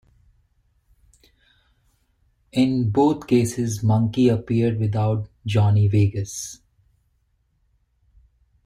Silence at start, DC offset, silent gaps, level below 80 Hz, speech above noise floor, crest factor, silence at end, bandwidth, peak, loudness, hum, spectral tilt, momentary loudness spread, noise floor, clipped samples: 2.55 s; under 0.1%; none; -52 dBFS; 47 dB; 16 dB; 2.1 s; 13 kHz; -6 dBFS; -21 LUFS; none; -7 dB/octave; 10 LU; -67 dBFS; under 0.1%